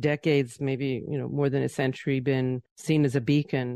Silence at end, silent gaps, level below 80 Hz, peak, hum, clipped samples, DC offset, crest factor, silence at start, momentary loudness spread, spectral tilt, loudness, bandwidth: 0 s; 2.71-2.76 s; -62 dBFS; -12 dBFS; none; under 0.1%; under 0.1%; 14 dB; 0 s; 7 LU; -7 dB/octave; -27 LUFS; 12.5 kHz